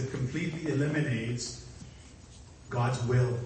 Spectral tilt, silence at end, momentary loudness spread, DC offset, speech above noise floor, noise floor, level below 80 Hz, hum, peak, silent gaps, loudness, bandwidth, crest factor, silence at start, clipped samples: -6 dB/octave; 0 s; 23 LU; under 0.1%; 21 dB; -51 dBFS; -54 dBFS; none; -16 dBFS; none; -31 LUFS; 8.8 kHz; 16 dB; 0 s; under 0.1%